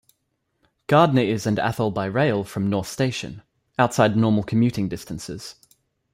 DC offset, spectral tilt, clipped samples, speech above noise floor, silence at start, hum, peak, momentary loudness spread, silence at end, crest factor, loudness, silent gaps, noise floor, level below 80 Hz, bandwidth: under 0.1%; -6.5 dB/octave; under 0.1%; 52 dB; 0.9 s; none; -2 dBFS; 15 LU; 0.6 s; 20 dB; -22 LUFS; none; -74 dBFS; -56 dBFS; 16 kHz